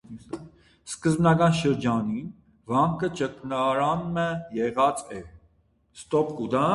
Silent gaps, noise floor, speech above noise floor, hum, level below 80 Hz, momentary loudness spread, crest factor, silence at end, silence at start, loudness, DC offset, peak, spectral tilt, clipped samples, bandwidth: none; -64 dBFS; 40 dB; none; -56 dBFS; 19 LU; 18 dB; 0 s; 0.1 s; -25 LUFS; under 0.1%; -8 dBFS; -6.5 dB/octave; under 0.1%; 11.5 kHz